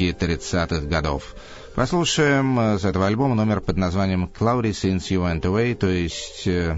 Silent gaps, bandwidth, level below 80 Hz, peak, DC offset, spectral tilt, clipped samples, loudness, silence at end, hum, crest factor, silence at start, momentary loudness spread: none; 8 kHz; -36 dBFS; -4 dBFS; under 0.1%; -5.5 dB/octave; under 0.1%; -22 LUFS; 0 s; none; 16 dB; 0 s; 8 LU